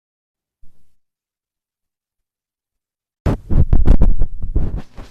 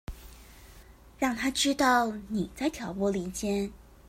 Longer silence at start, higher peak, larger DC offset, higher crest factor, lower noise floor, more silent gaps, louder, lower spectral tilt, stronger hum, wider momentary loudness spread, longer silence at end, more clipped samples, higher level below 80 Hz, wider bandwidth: first, 0.65 s vs 0.1 s; first, 0 dBFS vs -10 dBFS; neither; about the same, 16 dB vs 20 dB; first, -88 dBFS vs -52 dBFS; first, 3.20-3.25 s vs none; first, -20 LUFS vs -29 LUFS; first, -9.5 dB/octave vs -3.5 dB/octave; neither; about the same, 11 LU vs 10 LU; about the same, 0.1 s vs 0 s; neither; first, -20 dBFS vs -50 dBFS; second, 2.9 kHz vs 16 kHz